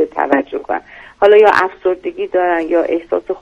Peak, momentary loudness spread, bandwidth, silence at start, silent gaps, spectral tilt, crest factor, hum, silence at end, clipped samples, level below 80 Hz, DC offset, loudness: 0 dBFS; 13 LU; 7.6 kHz; 0 s; none; -5 dB/octave; 14 dB; none; 0.05 s; 0.3%; -52 dBFS; under 0.1%; -14 LUFS